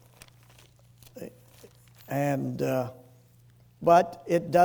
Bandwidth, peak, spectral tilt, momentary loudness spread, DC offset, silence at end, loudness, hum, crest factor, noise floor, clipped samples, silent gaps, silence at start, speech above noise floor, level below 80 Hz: over 20 kHz; -8 dBFS; -6.5 dB/octave; 23 LU; under 0.1%; 0 s; -27 LUFS; none; 20 dB; -58 dBFS; under 0.1%; none; 1.15 s; 33 dB; -64 dBFS